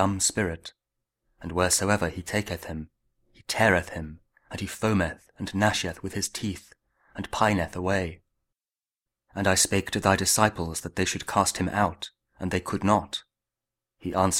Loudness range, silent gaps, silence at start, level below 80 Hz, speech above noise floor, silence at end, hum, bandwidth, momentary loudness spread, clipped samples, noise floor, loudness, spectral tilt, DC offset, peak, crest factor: 5 LU; none; 0 s; -50 dBFS; over 64 dB; 0 s; none; 16.5 kHz; 17 LU; under 0.1%; under -90 dBFS; -26 LUFS; -3.5 dB/octave; under 0.1%; -4 dBFS; 24 dB